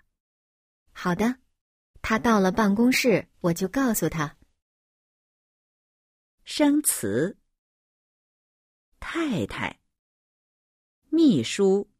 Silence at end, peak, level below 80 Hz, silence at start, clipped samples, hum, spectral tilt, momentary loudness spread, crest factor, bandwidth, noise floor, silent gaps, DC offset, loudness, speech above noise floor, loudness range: 0.15 s; -8 dBFS; -54 dBFS; 0.95 s; under 0.1%; none; -4.5 dB/octave; 13 LU; 18 dB; 15.5 kHz; under -90 dBFS; 1.61-1.94 s, 4.62-6.38 s, 7.58-8.92 s, 9.99-11.02 s; under 0.1%; -24 LUFS; over 67 dB; 9 LU